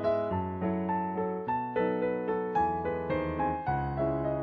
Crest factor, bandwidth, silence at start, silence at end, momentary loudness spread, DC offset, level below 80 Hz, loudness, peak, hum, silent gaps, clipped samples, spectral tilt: 12 dB; 5.8 kHz; 0 s; 0 s; 3 LU; under 0.1%; -50 dBFS; -31 LUFS; -18 dBFS; none; none; under 0.1%; -10 dB/octave